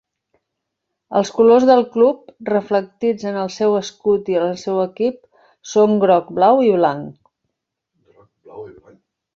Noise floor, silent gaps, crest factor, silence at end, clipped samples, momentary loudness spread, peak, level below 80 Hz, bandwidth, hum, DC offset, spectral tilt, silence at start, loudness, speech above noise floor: -78 dBFS; none; 16 dB; 0.65 s; under 0.1%; 11 LU; -2 dBFS; -62 dBFS; 7.6 kHz; none; under 0.1%; -6 dB/octave; 1.1 s; -17 LUFS; 62 dB